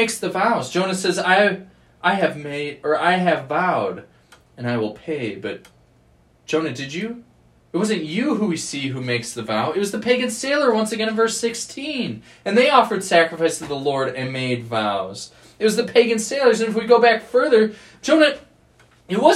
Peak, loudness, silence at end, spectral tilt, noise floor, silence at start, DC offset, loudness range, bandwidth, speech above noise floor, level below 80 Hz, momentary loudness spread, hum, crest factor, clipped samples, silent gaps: 0 dBFS; -20 LUFS; 0 s; -4 dB/octave; -56 dBFS; 0 s; under 0.1%; 9 LU; 14 kHz; 36 dB; -62 dBFS; 12 LU; none; 20 dB; under 0.1%; none